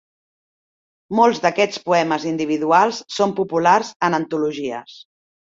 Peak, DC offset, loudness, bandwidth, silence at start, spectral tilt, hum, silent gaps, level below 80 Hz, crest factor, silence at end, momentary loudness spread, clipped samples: -2 dBFS; under 0.1%; -19 LUFS; 7.8 kHz; 1.1 s; -4.5 dB/octave; none; 3.96-4.00 s; -64 dBFS; 18 dB; 0.45 s; 8 LU; under 0.1%